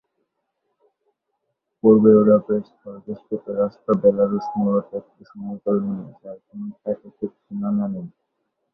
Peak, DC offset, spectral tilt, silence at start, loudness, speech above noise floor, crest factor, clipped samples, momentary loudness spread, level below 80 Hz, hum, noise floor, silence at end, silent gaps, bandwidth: -2 dBFS; under 0.1%; -12 dB/octave; 1.85 s; -20 LUFS; 56 dB; 20 dB; under 0.1%; 21 LU; -62 dBFS; none; -76 dBFS; 0.65 s; none; 5 kHz